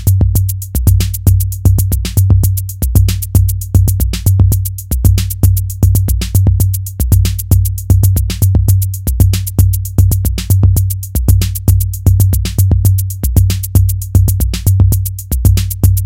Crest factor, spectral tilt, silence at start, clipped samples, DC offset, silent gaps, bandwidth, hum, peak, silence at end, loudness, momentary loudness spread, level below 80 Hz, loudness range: 10 dB; -6 dB/octave; 0 s; 0.5%; under 0.1%; none; 17 kHz; none; 0 dBFS; 0 s; -12 LUFS; 4 LU; -16 dBFS; 1 LU